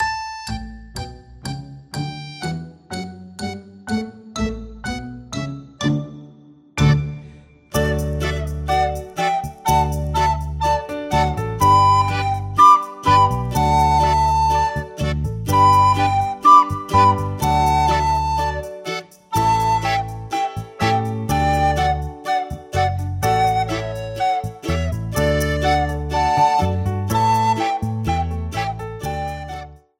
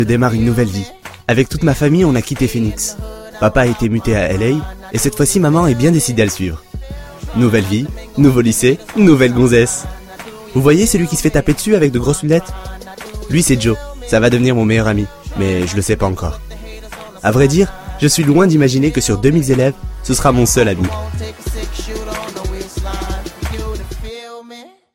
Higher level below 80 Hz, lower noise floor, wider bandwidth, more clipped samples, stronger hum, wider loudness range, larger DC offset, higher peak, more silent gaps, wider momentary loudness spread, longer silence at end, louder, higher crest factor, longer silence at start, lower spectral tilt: about the same, -32 dBFS vs -28 dBFS; first, -46 dBFS vs -38 dBFS; about the same, 16.5 kHz vs 16.5 kHz; neither; neither; first, 13 LU vs 4 LU; neither; about the same, 0 dBFS vs 0 dBFS; neither; about the same, 16 LU vs 18 LU; about the same, 0.25 s vs 0.25 s; second, -19 LUFS vs -14 LUFS; about the same, 18 dB vs 14 dB; about the same, 0 s vs 0 s; about the same, -5.5 dB/octave vs -5.5 dB/octave